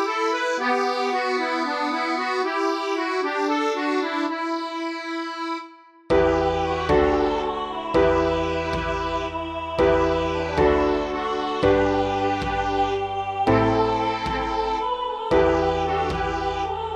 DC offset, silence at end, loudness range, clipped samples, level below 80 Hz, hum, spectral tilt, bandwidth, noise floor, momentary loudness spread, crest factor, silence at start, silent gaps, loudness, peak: under 0.1%; 0 s; 3 LU; under 0.1%; -40 dBFS; none; -5.5 dB/octave; 10 kHz; -44 dBFS; 8 LU; 16 dB; 0 s; none; -23 LUFS; -6 dBFS